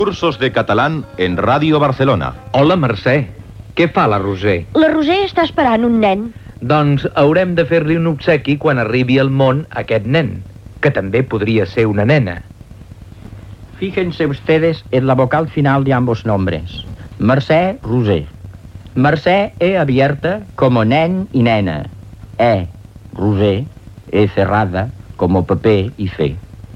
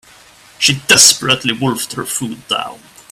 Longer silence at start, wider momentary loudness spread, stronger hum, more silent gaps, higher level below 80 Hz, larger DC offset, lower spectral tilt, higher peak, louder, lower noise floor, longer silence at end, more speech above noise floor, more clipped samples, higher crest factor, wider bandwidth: second, 0 s vs 0.6 s; about the same, 12 LU vs 14 LU; neither; neither; first, -40 dBFS vs -52 dBFS; neither; first, -8 dB/octave vs -1.5 dB/octave; about the same, 0 dBFS vs 0 dBFS; second, -15 LUFS vs -12 LUFS; second, -36 dBFS vs -43 dBFS; second, 0 s vs 0.35 s; second, 22 dB vs 29 dB; second, under 0.1% vs 0.2%; about the same, 14 dB vs 16 dB; second, 8.6 kHz vs over 20 kHz